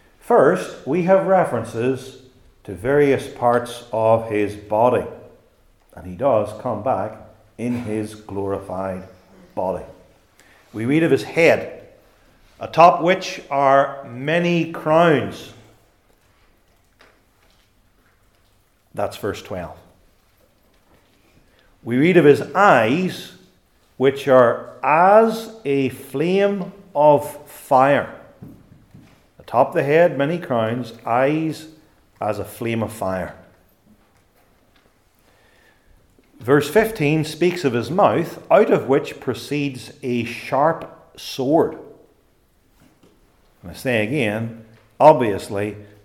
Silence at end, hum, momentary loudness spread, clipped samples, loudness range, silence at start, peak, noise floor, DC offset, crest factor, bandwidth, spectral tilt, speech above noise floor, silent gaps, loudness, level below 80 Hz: 0.2 s; none; 17 LU; under 0.1%; 12 LU; 0.25 s; 0 dBFS; -59 dBFS; under 0.1%; 20 dB; 17 kHz; -6.5 dB/octave; 41 dB; none; -19 LUFS; -58 dBFS